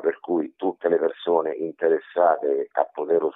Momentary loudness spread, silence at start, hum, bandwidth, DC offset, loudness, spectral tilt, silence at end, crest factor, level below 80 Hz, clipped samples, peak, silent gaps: 6 LU; 0 s; none; 4 kHz; under 0.1%; -24 LUFS; -9.5 dB/octave; 0.05 s; 18 dB; -78 dBFS; under 0.1%; -6 dBFS; none